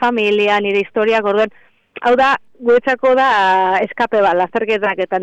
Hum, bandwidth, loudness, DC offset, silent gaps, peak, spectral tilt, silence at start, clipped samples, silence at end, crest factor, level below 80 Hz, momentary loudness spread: none; 8.2 kHz; -15 LUFS; under 0.1%; none; -6 dBFS; -5 dB/octave; 0 s; under 0.1%; 0 s; 10 dB; -54 dBFS; 5 LU